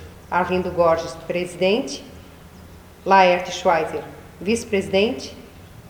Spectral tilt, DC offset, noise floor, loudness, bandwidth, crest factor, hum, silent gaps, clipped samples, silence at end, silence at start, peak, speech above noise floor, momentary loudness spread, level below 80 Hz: -4.5 dB/octave; under 0.1%; -43 dBFS; -20 LUFS; over 20 kHz; 20 dB; none; none; under 0.1%; 0 s; 0 s; -2 dBFS; 23 dB; 17 LU; -50 dBFS